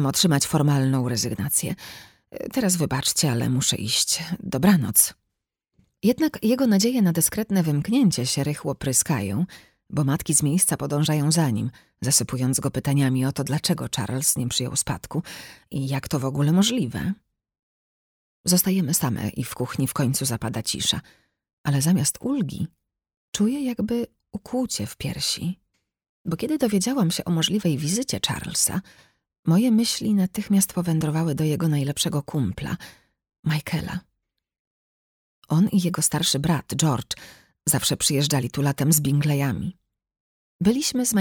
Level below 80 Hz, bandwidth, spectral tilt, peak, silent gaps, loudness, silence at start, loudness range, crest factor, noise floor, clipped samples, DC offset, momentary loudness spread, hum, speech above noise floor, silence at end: -52 dBFS; 20 kHz; -4.5 dB/octave; -2 dBFS; 17.59-18.44 s, 21.53-21.64 s, 23.17-23.33 s, 26.09-26.25 s, 29.39-29.43 s, 33.39-33.43 s, 34.59-35.42 s, 40.20-40.59 s; -23 LUFS; 0 s; 5 LU; 22 dB; -81 dBFS; under 0.1%; under 0.1%; 11 LU; none; 58 dB; 0 s